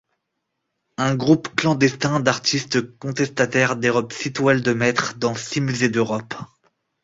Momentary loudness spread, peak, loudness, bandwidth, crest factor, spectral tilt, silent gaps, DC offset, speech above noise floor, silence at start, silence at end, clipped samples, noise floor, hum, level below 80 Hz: 7 LU; -2 dBFS; -20 LUFS; 8 kHz; 20 dB; -5 dB/octave; none; under 0.1%; 57 dB; 1 s; 0.6 s; under 0.1%; -77 dBFS; none; -58 dBFS